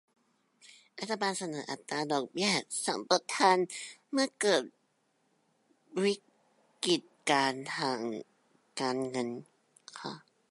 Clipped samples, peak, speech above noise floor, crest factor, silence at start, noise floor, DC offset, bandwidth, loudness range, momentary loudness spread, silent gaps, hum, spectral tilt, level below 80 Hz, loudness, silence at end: under 0.1%; -10 dBFS; 43 dB; 24 dB; 0.95 s; -75 dBFS; under 0.1%; 11.5 kHz; 4 LU; 16 LU; none; none; -3 dB/octave; -86 dBFS; -32 LUFS; 0.35 s